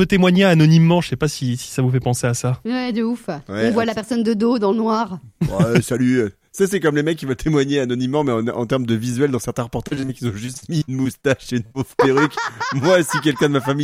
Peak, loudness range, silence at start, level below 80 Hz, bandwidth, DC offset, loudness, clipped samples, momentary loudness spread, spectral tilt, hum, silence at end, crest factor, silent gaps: 0 dBFS; 3 LU; 0 s; -46 dBFS; 15.5 kHz; under 0.1%; -19 LUFS; under 0.1%; 11 LU; -6 dB/octave; none; 0 s; 18 dB; none